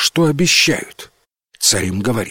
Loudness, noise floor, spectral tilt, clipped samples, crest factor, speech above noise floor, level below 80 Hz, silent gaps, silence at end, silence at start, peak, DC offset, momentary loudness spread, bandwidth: -14 LUFS; -47 dBFS; -3 dB/octave; under 0.1%; 16 dB; 31 dB; -48 dBFS; none; 0 s; 0 s; -2 dBFS; under 0.1%; 10 LU; 16.5 kHz